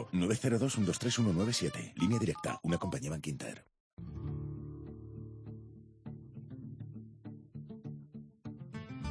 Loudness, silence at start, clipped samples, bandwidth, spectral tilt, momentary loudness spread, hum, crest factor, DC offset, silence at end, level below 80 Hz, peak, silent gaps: -35 LUFS; 0 s; under 0.1%; 11 kHz; -5.5 dB/octave; 18 LU; none; 18 dB; under 0.1%; 0 s; -58 dBFS; -18 dBFS; 3.80-3.97 s